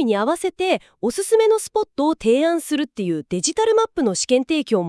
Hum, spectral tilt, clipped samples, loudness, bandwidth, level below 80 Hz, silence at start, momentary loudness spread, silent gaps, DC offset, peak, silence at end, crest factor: none; -4 dB/octave; under 0.1%; -20 LUFS; 12 kHz; -56 dBFS; 0 s; 6 LU; none; under 0.1%; -4 dBFS; 0 s; 14 dB